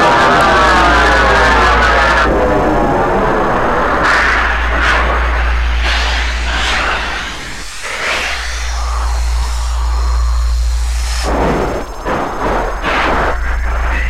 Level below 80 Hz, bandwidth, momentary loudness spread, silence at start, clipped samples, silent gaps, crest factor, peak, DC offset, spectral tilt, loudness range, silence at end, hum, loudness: -18 dBFS; 13 kHz; 10 LU; 0 s; under 0.1%; none; 10 dB; -2 dBFS; under 0.1%; -4.5 dB/octave; 7 LU; 0 s; none; -13 LUFS